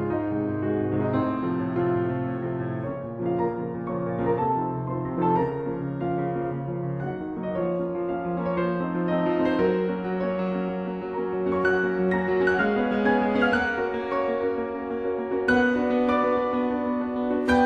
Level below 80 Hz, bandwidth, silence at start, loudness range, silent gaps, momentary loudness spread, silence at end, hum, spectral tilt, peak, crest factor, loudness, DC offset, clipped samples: -52 dBFS; 8.6 kHz; 0 s; 4 LU; none; 8 LU; 0 s; none; -8.5 dB/octave; -8 dBFS; 16 dB; -26 LUFS; under 0.1%; under 0.1%